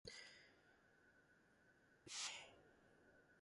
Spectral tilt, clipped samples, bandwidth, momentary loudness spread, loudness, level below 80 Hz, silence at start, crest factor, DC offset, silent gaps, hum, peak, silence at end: 0 dB/octave; under 0.1%; 11.5 kHz; 18 LU; -52 LUFS; -84 dBFS; 0.05 s; 24 dB; under 0.1%; none; none; -36 dBFS; 0 s